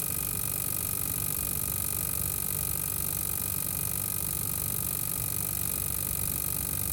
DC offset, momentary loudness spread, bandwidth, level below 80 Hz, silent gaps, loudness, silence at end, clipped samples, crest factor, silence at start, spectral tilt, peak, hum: under 0.1%; 1 LU; 19.5 kHz; -46 dBFS; none; -28 LUFS; 0 s; under 0.1%; 18 dB; 0 s; -2.5 dB/octave; -14 dBFS; none